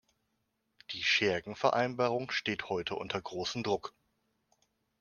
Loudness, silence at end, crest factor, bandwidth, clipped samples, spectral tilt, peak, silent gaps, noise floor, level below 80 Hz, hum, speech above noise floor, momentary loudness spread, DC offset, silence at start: -32 LUFS; 1.1 s; 22 dB; 10 kHz; under 0.1%; -4 dB/octave; -12 dBFS; none; -80 dBFS; -70 dBFS; none; 47 dB; 9 LU; under 0.1%; 0.9 s